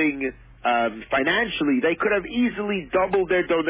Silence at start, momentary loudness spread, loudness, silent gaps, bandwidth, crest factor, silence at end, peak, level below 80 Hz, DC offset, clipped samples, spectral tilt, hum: 0 s; 6 LU; -23 LUFS; none; 4 kHz; 14 dB; 0 s; -10 dBFS; -50 dBFS; under 0.1%; under 0.1%; -8.5 dB/octave; none